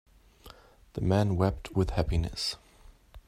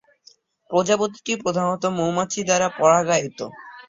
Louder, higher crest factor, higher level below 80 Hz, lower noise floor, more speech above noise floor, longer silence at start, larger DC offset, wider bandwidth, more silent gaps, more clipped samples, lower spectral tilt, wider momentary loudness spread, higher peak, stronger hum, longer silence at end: second, -29 LUFS vs -21 LUFS; about the same, 20 dB vs 20 dB; first, -42 dBFS vs -62 dBFS; about the same, -56 dBFS vs -55 dBFS; second, 28 dB vs 34 dB; second, 0.45 s vs 0.7 s; neither; first, 14.5 kHz vs 7.8 kHz; neither; neither; first, -6.5 dB/octave vs -4 dB/octave; about the same, 8 LU vs 8 LU; second, -12 dBFS vs -2 dBFS; neither; about the same, 0.1 s vs 0.05 s